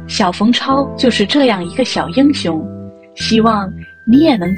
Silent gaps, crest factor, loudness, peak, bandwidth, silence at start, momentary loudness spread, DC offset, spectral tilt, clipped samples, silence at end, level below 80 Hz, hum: none; 14 dB; -13 LUFS; 0 dBFS; 9.6 kHz; 0 s; 12 LU; under 0.1%; -5 dB/octave; under 0.1%; 0 s; -42 dBFS; none